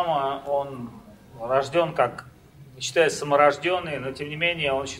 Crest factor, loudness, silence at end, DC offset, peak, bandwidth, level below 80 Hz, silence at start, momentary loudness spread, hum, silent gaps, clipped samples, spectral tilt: 22 dB; -24 LUFS; 0 s; under 0.1%; -4 dBFS; 15 kHz; -58 dBFS; 0 s; 15 LU; none; none; under 0.1%; -4 dB/octave